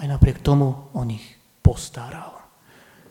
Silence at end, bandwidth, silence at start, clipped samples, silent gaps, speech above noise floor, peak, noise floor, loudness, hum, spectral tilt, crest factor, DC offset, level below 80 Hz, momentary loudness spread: 0.7 s; 14 kHz; 0 s; under 0.1%; none; 31 dB; 0 dBFS; -52 dBFS; -22 LUFS; none; -7.5 dB/octave; 22 dB; under 0.1%; -30 dBFS; 17 LU